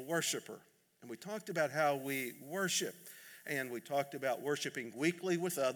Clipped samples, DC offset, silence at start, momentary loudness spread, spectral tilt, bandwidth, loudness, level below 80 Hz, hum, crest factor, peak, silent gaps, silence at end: under 0.1%; under 0.1%; 0 s; 15 LU; -3.5 dB/octave; over 20 kHz; -37 LUFS; under -90 dBFS; none; 18 dB; -20 dBFS; none; 0 s